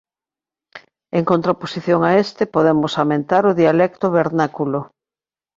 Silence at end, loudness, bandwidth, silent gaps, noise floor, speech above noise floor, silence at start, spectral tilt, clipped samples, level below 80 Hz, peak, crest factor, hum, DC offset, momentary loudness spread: 0.7 s; -17 LUFS; 7.6 kHz; none; under -90 dBFS; over 74 dB; 0.75 s; -7.5 dB/octave; under 0.1%; -58 dBFS; -2 dBFS; 16 dB; none; under 0.1%; 8 LU